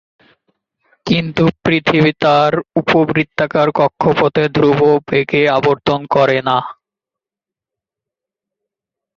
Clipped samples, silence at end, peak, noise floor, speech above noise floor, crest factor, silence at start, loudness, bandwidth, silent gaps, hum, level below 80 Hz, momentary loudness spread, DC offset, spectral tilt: under 0.1%; 2.45 s; 0 dBFS; -87 dBFS; 74 dB; 14 dB; 1.05 s; -14 LUFS; 7.2 kHz; none; none; -50 dBFS; 5 LU; under 0.1%; -7 dB/octave